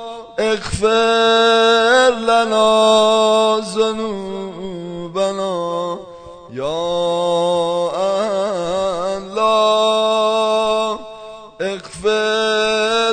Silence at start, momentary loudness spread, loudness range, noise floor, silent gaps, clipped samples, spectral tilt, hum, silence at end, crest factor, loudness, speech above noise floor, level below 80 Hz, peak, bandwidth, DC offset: 0 s; 15 LU; 8 LU; -36 dBFS; none; under 0.1%; -3.5 dB/octave; none; 0 s; 14 dB; -16 LUFS; 22 dB; -46 dBFS; -2 dBFS; 9.4 kHz; under 0.1%